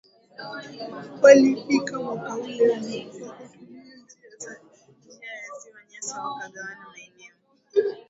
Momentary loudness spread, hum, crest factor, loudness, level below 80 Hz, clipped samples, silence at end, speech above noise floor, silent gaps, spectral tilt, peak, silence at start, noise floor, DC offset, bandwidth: 26 LU; none; 24 dB; -22 LUFS; -72 dBFS; under 0.1%; 0.1 s; 33 dB; none; -4 dB/octave; 0 dBFS; 0.4 s; -56 dBFS; under 0.1%; 8 kHz